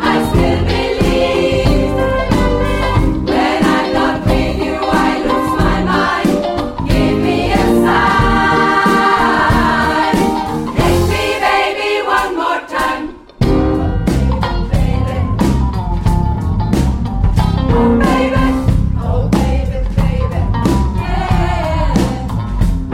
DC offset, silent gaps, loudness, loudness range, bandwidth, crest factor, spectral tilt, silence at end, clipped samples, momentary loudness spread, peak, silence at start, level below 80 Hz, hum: under 0.1%; none; -14 LUFS; 4 LU; 16 kHz; 14 dB; -6.5 dB/octave; 0 s; under 0.1%; 6 LU; 0 dBFS; 0 s; -20 dBFS; none